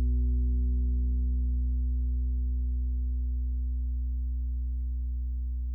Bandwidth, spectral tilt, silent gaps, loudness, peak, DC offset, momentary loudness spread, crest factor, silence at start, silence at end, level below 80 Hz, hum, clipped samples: 0.5 kHz; -14 dB/octave; none; -32 LUFS; -22 dBFS; under 0.1%; 5 LU; 6 dB; 0 s; 0 s; -28 dBFS; 60 Hz at -80 dBFS; under 0.1%